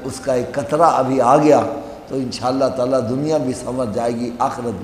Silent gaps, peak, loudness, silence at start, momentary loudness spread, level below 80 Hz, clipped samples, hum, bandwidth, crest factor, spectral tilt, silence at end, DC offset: none; 0 dBFS; -18 LUFS; 0 s; 11 LU; -50 dBFS; under 0.1%; none; 14.5 kHz; 18 dB; -6 dB/octave; 0 s; under 0.1%